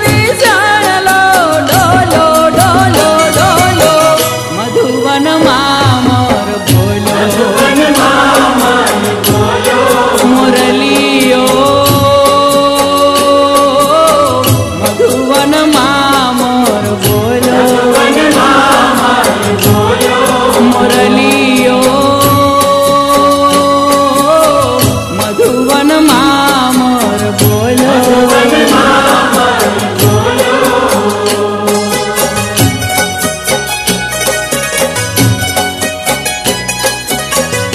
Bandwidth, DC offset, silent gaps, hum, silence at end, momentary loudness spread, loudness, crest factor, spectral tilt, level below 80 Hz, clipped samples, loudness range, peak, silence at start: 14.5 kHz; under 0.1%; none; none; 0 s; 5 LU; -8 LUFS; 8 dB; -4 dB/octave; -34 dBFS; 0.7%; 4 LU; 0 dBFS; 0 s